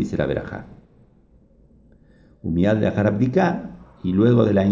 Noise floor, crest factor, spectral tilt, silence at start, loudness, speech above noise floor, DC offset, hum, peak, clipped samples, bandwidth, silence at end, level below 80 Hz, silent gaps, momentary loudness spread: -54 dBFS; 16 dB; -9 dB/octave; 0 s; -20 LUFS; 35 dB; under 0.1%; none; -4 dBFS; under 0.1%; 7.4 kHz; 0 s; -44 dBFS; none; 17 LU